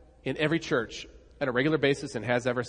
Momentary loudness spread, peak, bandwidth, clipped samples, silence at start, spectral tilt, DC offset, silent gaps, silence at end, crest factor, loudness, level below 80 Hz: 13 LU; -10 dBFS; 10.5 kHz; under 0.1%; 0.25 s; -5.5 dB/octave; under 0.1%; none; 0 s; 18 dB; -28 LUFS; -56 dBFS